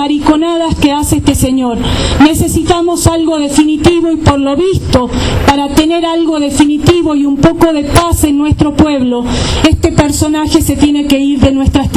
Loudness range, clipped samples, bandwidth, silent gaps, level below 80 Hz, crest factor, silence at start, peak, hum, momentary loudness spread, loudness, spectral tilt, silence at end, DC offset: 1 LU; 0.9%; 14.5 kHz; none; -22 dBFS; 8 dB; 0 s; 0 dBFS; none; 4 LU; -10 LUFS; -5.5 dB/octave; 0 s; under 0.1%